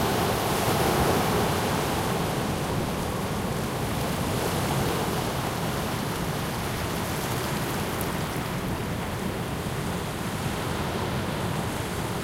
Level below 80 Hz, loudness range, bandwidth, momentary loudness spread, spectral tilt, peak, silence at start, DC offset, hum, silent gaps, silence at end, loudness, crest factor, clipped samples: -42 dBFS; 4 LU; 16 kHz; 6 LU; -5 dB/octave; -12 dBFS; 0 s; under 0.1%; none; none; 0 s; -27 LUFS; 16 dB; under 0.1%